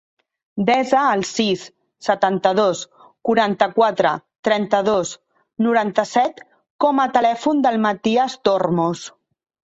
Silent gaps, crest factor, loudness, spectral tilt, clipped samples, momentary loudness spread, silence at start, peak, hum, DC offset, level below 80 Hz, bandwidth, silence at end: 4.39-4.43 s, 6.70-6.79 s; 18 dB; -19 LUFS; -5 dB/octave; under 0.1%; 11 LU; 0.55 s; -2 dBFS; none; under 0.1%; -62 dBFS; 8.2 kHz; 0.65 s